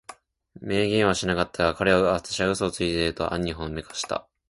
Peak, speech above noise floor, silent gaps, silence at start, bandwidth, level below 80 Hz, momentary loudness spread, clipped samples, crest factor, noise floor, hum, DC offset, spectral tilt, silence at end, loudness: -6 dBFS; 25 dB; none; 0.1 s; 11.5 kHz; -46 dBFS; 11 LU; under 0.1%; 20 dB; -50 dBFS; none; under 0.1%; -4.5 dB/octave; 0.3 s; -25 LUFS